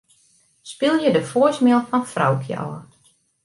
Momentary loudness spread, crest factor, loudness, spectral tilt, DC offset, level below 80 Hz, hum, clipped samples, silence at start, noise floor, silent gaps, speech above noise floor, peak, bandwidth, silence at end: 15 LU; 16 dB; -19 LUFS; -6 dB/octave; under 0.1%; -66 dBFS; none; under 0.1%; 0.65 s; -60 dBFS; none; 41 dB; -4 dBFS; 11.5 kHz; 0.6 s